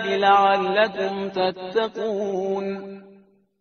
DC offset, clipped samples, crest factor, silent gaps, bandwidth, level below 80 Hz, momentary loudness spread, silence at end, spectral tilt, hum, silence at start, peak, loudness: under 0.1%; under 0.1%; 18 dB; none; 6.6 kHz; -66 dBFS; 11 LU; 0.5 s; -2.5 dB/octave; none; 0 s; -4 dBFS; -22 LUFS